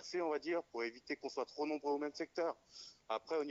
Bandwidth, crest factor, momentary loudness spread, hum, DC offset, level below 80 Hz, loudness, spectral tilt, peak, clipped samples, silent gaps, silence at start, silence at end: 7.6 kHz; 14 dB; 6 LU; none; under 0.1%; -84 dBFS; -41 LUFS; -2 dB/octave; -26 dBFS; under 0.1%; none; 0 s; 0 s